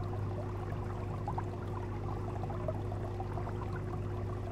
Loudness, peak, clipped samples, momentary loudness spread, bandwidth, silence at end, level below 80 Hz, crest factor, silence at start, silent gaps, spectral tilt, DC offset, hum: -39 LUFS; -22 dBFS; under 0.1%; 1 LU; 8.6 kHz; 0 s; -46 dBFS; 16 dB; 0 s; none; -8.5 dB/octave; under 0.1%; none